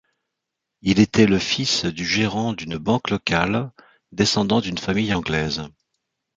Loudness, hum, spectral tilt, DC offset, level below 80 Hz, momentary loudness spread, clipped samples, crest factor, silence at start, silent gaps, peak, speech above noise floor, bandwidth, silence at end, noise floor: -21 LUFS; none; -4.5 dB/octave; under 0.1%; -46 dBFS; 9 LU; under 0.1%; 20 dB; 0.85 s; none; -2 dBFS; 61 dB; 9 kHz; 0.7 s; -82 dBFS